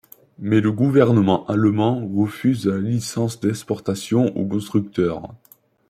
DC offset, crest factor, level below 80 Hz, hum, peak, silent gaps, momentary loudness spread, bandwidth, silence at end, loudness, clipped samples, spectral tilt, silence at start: under 0.1%; 18 dB; -58 dBFS; none; -2 dBFS; none; 9 LU; 15.5 kHz; 0.55 s; -20 LUFS; under 0.1%; -7 dB/octave; 0.4 s